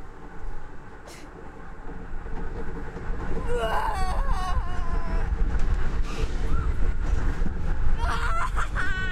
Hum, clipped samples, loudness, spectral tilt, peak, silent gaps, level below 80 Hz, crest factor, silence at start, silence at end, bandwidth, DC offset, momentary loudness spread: none; under 0.1%; -30 LUFS; -6 dB/octave; -10 dBFS; none; -26 dBFS; 14 dB; 0 s; 0 s; 9.6 kHz; under 0.1%; 16 LU